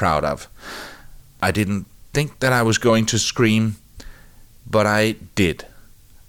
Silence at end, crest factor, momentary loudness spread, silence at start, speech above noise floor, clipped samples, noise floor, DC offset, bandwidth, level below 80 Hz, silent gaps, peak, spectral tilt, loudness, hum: 0.5 s; 14 dB; 17 LU; 0 s; 26 dB; under 0.1%; -45 dBFS; under 0.1%; 17.5 kHz; -44 dBFS; none; -6 dBFS; -4.5 dB/octave; -20 LUFS; none